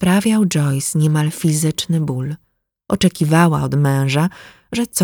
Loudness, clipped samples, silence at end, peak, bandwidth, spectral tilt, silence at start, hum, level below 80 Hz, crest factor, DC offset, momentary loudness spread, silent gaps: -17 LUFS; under 0.1%; 0 s; 0 dBFS; 19.5 kHz; -5.5 dB/octave; 0 s; none; -48 dBFS; 16 dB; under 0.1%; 10 LU; none